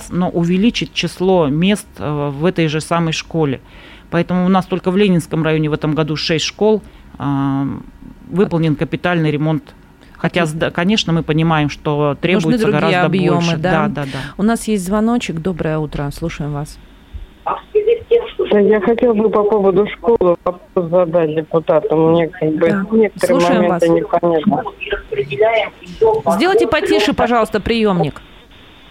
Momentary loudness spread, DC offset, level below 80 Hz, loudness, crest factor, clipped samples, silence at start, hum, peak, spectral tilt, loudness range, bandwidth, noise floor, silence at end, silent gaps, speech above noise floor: 8 LU; under 0.1%; -40 dBFS; -16 LUFS; 12 dB; under 0.1%; 0 s; none; -2 dBFS; -6.5 dB/octave; 4 LU; 15.5 kHz; -42 dBFS; 0.7 s; none; 27 dB